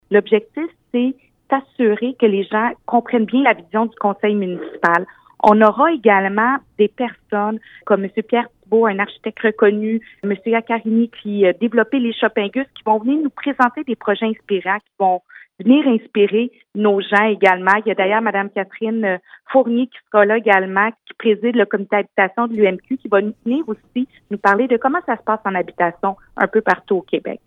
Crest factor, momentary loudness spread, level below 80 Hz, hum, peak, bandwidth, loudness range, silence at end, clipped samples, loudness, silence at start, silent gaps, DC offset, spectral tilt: 18 dB; 9 LU; -64 dBFS; none; 0 dBFS; 6.6 kHz; 3 LU; 0.1 s; under 0.1%; -17 LUFS; 0.1 s; none; under 0.1%; -7.5 dB/octave